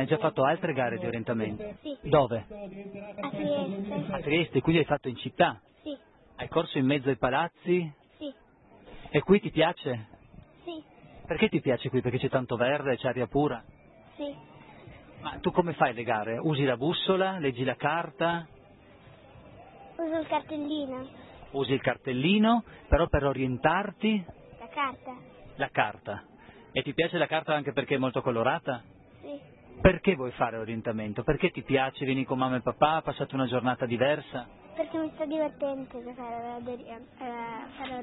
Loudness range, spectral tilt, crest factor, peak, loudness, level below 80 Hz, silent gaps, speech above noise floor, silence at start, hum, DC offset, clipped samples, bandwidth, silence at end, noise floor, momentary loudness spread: 5 LU; -10.5 dB/octave; 22 dB; -8 dBFS; -29 LUFS; -48 dBFS; none; 29 dB; 0 s; none; under 0.1%; under 0.1%; 4.1 kHz; 0 s; -57 dBFS; 16 LU